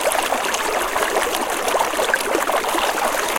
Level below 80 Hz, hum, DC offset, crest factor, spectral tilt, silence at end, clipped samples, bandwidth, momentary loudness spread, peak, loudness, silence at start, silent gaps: -46 dBFS; none; under 0.1%; 18 dB; -1 dB/octave; 0 s; under 0.1%; 17 kHz; 1 LU; -2 dBFS; -19 LUFS; 0 s; none